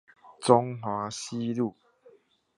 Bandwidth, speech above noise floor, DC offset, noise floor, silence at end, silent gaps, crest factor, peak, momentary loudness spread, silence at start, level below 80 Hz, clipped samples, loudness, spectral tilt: 11.5 kHz; 34 dB; under 0.1%; -60 dBFS; 0.85 s; none; 26 dB; -4 dBFS; 10 LU; 0.25 s; -70 dBFS; under 0.1%; -28 LUFS; -5.5 dB/octave